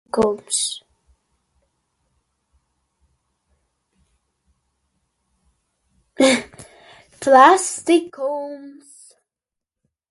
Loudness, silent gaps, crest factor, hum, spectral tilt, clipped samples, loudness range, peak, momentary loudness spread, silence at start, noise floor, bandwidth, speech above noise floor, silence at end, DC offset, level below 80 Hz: -17 LUFS; none; 22 dB; none; -2.5 dB/octave; under 0.1%; 9 LU; 0 dBFS; 22 LU; 0.15 s; -86 dBFS; 11.5 kHz; 69 dB; 1.4 s; under 0.1%; -60 dBFS